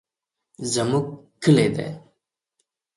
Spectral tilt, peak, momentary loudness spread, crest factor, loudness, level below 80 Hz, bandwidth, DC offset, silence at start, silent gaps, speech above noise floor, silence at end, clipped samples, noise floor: -5.5 dB/octave; -6 dBFS; 16 LU; 20 dB; -22 LUFS; -60 dBFS; 11.5 kHz; under 0.1%; 0.6 s; none; 64 dB; 0.95 s; under 0.1%; -84 dBFS